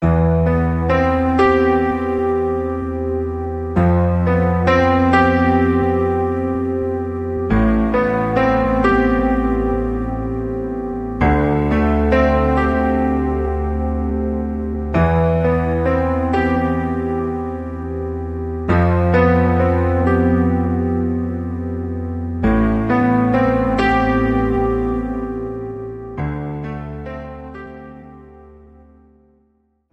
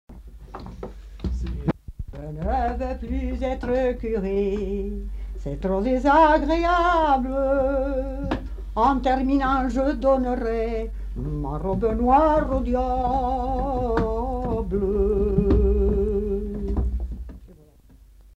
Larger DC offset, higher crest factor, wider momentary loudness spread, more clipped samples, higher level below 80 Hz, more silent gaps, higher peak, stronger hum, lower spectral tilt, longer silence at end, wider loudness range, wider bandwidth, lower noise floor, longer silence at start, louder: neither; about the same, 16 dB vs 16 dB; second, 11 LU vs 15 LU; neither; about the same, -28 dBFS vs -30 dBFS; neither; first, -2 dBFS vs -6 dBFS; neither; about the same, -9 dB/octave vs -8 dB/octave; first, 1.4 s vs 0.85 s; about the same, 6 LU vs 6 LU; about the same, 7.8 kHz vs 7.8 kHz; first, -62 dBFS vs -51 dBFS; about the same, 0 s vs 0.1 s; first, -18 LUFS vs -23 LUFS